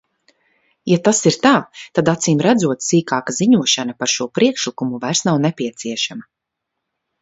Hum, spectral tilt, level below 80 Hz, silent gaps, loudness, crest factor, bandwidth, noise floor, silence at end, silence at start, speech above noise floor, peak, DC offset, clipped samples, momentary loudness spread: none; -4 dB/octave; -60 dBFS; none; -17 LUFS; 18 dB; 8 kHz; -79 dBFS; 1 s; 0.85 s; 62 dB; 0 dBFS; under 0.1%; under 0.1%; 9 LU